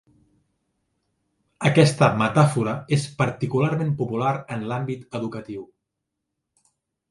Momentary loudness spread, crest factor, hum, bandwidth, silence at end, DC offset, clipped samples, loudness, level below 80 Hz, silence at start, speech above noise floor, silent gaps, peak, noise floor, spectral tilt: 13 LU; 22 dB; none; 11.5 kHz; 1.45 s; under 0.1%; under 0.1%; -22 LUFS; -60 dBFS; 1.6 s; 60 dB; none; -2 dBFS; -81 dBFS; -6.5 dB/octave